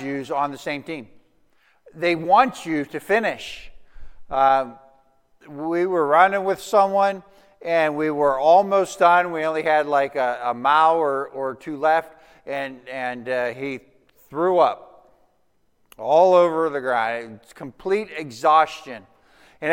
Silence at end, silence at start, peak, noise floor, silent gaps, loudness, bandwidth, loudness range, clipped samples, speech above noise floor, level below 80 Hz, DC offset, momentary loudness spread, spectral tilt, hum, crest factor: 0 s; 0 s; -2 dBFS; -68 dBFS; none; -20 LUFS; 16.5 kHz; 6 LU; under 0.1%; 48 dB; -58 dBFS; under 0.1%; 17 LU; -5 dB/octave; none; 20 dB